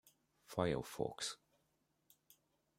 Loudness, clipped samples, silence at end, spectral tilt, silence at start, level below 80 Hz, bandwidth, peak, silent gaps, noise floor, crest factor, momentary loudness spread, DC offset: -42 LUFS; under 0.1%; 1.45 s; -4.5 dB/octave; 0.5 s; -70 dBFS; 16.5 kHz; -20 dBFS; none; -82 dBFS; 26 dB; 8 LU; under 0.1%